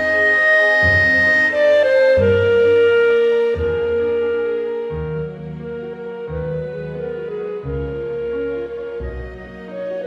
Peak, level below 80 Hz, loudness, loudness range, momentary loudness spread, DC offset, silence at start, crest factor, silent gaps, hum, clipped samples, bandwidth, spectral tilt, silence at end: -4 dBFS; -38 dBFS; -16 LUFS; 13 LU; 17 LU; under 0.1%; 0 s; 12 dB; none; none; under 0.1%; 8.6 kHz; -6.5 dB/octave; 0 s